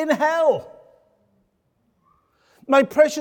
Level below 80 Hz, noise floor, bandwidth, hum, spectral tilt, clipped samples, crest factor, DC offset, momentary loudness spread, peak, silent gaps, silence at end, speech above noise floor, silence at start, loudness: -68 dBFS; -68 dBFS; 18.5 kHz; none; -4 dB/octave; under 0.1%; 18 dB; under 0.1%; 4 LU; -4 dBFS; none; 0 s; 50 dB; 0 s; -19 LUFS